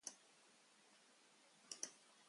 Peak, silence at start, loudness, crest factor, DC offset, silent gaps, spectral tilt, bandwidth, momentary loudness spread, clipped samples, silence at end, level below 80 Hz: -28 dBFS; 0 s; -54 LUFS; 32 dB; under 0.1%; none; 1 dB/octave; 11.5 kHz; 18 LU; under 0.1%; 0 s; under -90 dBFS